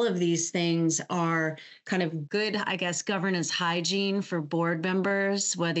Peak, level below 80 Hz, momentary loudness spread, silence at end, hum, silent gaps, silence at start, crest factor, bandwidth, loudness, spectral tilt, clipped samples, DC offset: -14 dBFS; -82 dBFS; 4 LU; 0 s; none; none; 0 s; 14 dB; 8.2 kHz; -27 LUFS; -4 dB/octave; under 0.1%; under 0.1%